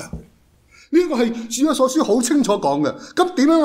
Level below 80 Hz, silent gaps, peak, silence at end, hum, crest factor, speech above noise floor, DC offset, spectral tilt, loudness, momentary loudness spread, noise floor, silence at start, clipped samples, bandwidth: -48 dBFS; none; -4 dBFS; 0 s; none; 14 dB; 36 dB; under 0.1%; -4 dB/octave; -18 LUFS; 5 LU; -53 dBFS; 0 s; under 0.1%; 16 kHz